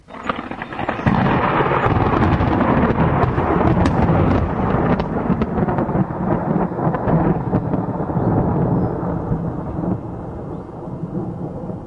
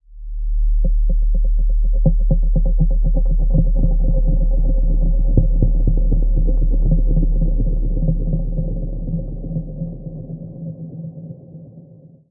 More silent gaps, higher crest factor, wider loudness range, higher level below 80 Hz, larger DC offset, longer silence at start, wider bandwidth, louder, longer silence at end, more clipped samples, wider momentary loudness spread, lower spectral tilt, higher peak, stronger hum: neither; about the same, 16 dB vs 14 dB; second, 5 LU vs 8 LU; second, -32 dBFS vs -16 dBFS; neither; about the same, 0.1 s vs 0.1 s; first, 7.4 kHz vs 0.9 kHz; about the same, -19 LUFS vs -21 LUFS; second, 0 s vs 0.5 s; neither; about the same, 11 LU vs 13 LU; second, -9.5 dB/octave vs -17.5 dB/octave; about the same, -2 dBFS vs -2 dBFS; neither